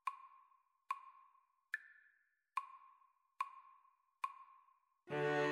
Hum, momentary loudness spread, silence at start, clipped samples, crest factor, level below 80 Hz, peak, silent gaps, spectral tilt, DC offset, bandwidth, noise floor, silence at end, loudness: none; 23 LU; 0.05 s; under 0.1%; 20 dB; under -90 dBFS; -26 dBFS; none; -5.5 dB/octave; under 0.1%; 13 kHz; -78 dBFS; 0 s; -46 LUFS